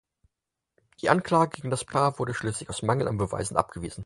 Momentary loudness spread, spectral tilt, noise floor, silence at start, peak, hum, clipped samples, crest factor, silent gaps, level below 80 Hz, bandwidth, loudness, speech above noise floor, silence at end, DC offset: 8 LU; -5.5 dB/octave; -86 dBFS; 1.05 s; -4 dBFS; none; under 0.1%; 24 dB; none; -52 dBFS; 11.5 kHz; -27 LUFS; 60 dB; 0 s; under 0.1%